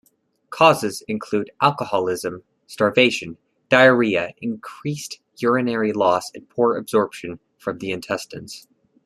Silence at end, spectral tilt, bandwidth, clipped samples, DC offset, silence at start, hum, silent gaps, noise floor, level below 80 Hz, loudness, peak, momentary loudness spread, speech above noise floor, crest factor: 0.45 s; -4.5 dB/octave; 13.5 kHz; under 0.1%; under 0.1%; 0.5 s; none; none; -44 dBFS; -64 dBFS; -20 LUFS; -2 dBFS; 19 LU; 24 dB; 20 dB